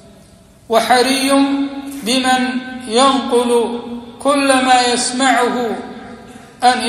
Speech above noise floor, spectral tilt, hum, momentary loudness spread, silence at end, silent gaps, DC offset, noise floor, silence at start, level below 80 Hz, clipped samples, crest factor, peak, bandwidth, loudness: 30 dB; -2 dB/octave; none; 12 LU; 0 s; none; under 0.1%; -44 dBFS; 0.7 s; -52 dBFS; under 0.1%; 16 dB; 0 dBFS; 14 kHz; -14 LUFS